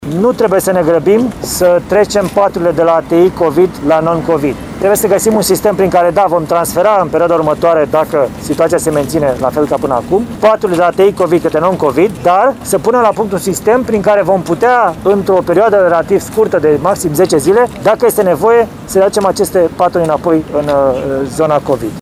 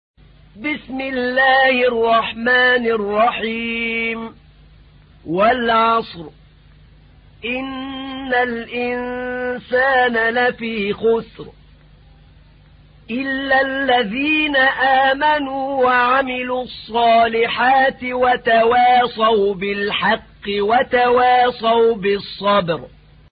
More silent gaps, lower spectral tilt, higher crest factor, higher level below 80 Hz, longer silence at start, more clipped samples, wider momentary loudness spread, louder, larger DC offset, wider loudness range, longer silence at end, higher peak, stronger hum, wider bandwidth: neither; second, -5.5 dB/octave vs -9.5 dB/octave; about the same, 10 dB vs 14 dB; first, -38 dBFS vs -48 dBFS; second, 0 s vs 0.55 s; neither; second, 4 LU vs 11 LU; first, -11 LUFS vs -17 LUFS; neither; second, 1 LU vs 6 LU; second, 0 s vs 0.45 s; first, 0 dBFS vs -4 dBFS; neither; first, 16 kHz vs 5.2 kHz